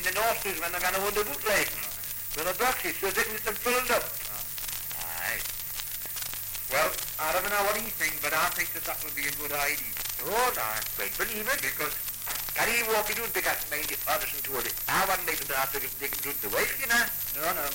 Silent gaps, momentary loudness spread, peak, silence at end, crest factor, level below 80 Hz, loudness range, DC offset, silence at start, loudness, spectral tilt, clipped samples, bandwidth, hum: none; 7 LU; -12 dBFS; 0 s; 18 dB; -52 dBFS; 2 LU; under 0.1%; 0 s; -28 LUFS; -1 dB/octave; under 0.1%; 17 kHz; none